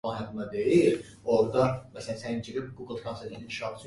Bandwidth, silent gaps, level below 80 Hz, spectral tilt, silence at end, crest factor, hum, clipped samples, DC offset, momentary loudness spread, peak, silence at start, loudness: 11.5 kHz; none; -58 dBFS; -6.5 dB/octave; 0 s; 18 dB; none; under 0.1%; under 0.1%; 15 LU; -10 dBFS; 0.05 s; -29 LUFS